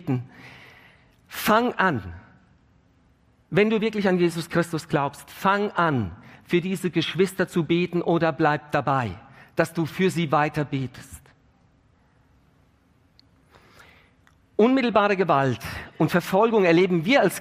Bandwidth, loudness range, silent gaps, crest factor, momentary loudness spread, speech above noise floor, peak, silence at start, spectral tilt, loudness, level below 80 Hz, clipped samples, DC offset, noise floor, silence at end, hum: 15.5 kHz; 6 LU; none; 20 dB; 12 LU; 38 dB; -4 dBFS; 0 s; -6 dB/octave; -23 LUFS; -58 dBFS; under 0.1%; under 0.1%; -61 dBFS; 0 s; none